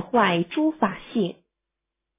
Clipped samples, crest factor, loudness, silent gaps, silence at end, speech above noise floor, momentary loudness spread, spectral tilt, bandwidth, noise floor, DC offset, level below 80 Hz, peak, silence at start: under 0.1%; 18 dB; -24 LUFS; none; 0.85 s; 62 dB; 7 LU; -10 dB/octave; 3.8 kHz; -84 dBFS; under 0.1%; -64 dBFS; -6 dBFS; 0 s